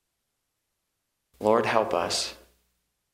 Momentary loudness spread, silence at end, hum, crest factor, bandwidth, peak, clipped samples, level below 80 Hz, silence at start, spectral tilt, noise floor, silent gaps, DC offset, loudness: 6 LU; 0.8 s; none; 22 dB; 16 kHz; -6 dBFS; under 0.1%; -64 dBFS; 1.4 s; -3 dB/octave; -80 dBFS; none; under 0.1%; -26 LUFS